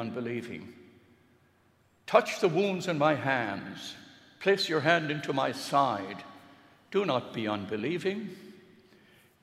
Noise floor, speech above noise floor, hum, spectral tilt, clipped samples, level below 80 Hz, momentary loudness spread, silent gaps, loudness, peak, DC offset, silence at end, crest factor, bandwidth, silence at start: -66 dBFS; 37 dB; none; -5 dB/octave; under 0.1%; -78 dBFS; 17 LU; none; -29 LUFS; -8 dBFS; under 0.1%; 0.85 s; 24 dB; 15 kHz; 0 s